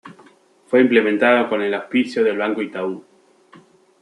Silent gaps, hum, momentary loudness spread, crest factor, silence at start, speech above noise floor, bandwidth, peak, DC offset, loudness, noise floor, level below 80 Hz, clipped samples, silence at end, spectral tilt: none; none; 11 LU; 18 dB; 0.05 s; 34 dB; 11 kHz; -2 dBFS; under 0.1%; -18 LUFS; -51 dBFS; -72 dBFS; under 0.1%; 1 s; -6 dB/octave